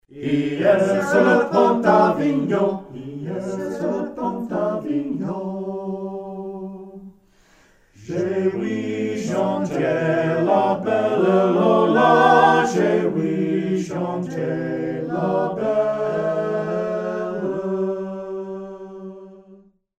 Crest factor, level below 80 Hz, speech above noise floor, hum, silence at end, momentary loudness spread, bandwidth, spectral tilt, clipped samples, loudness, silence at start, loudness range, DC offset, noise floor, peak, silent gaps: 18 dB; -60 dBFS; 37 dB; none; 0.45 s; 15 LU; 13.5 kHz; -7 dB/octave; under 0.1%; -20 LUFS; 0.1 s; 11 LU; under 0.1%; -55 dBFS; -2 dBFS; none